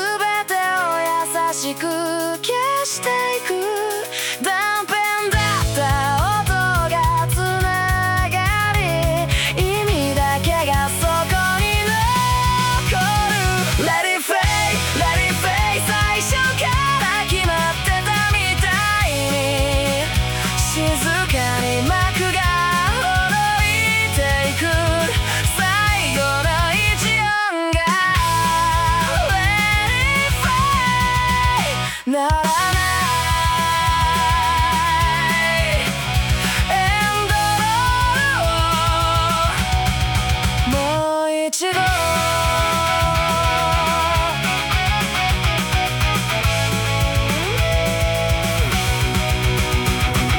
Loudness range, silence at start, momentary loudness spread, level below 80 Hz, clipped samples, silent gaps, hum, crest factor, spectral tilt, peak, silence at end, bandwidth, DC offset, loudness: 2 LU; 0 s; 3 LU; -28 dBFS; under 0.1%; none; none; 14 dB; -3.5 dB/octave; -4 dBFS; 0 s; 19 kHz; under 0.1%; -18 LUFS